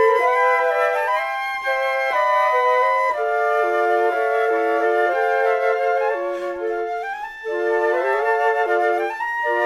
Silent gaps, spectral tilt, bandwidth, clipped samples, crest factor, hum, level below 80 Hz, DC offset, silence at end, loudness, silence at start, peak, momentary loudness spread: none; -2 dB/octave; 13 kHz; under 0.1%; 14 dB; none; -62 dBFS; under 0.1%; 0 s; -19 LUFS; 0 s; -6 dBFS; 8 LU